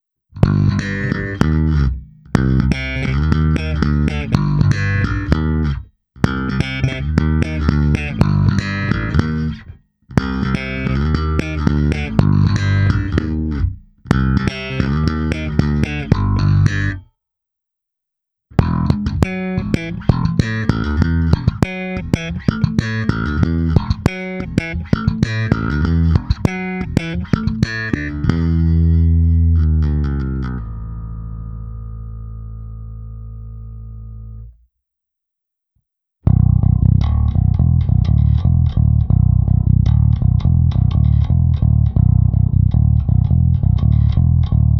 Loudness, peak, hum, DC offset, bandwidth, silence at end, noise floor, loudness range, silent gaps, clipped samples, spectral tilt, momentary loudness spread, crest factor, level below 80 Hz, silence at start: -17 LUFS; 0 dBFS; none; under 0.1%; 8.2 kHz; 0 s; -81 dBFS; 7 LU; none; under 0.1%; -8 dB/octave; 14 LU; 16 dB; -22 dBFS; 0.35 s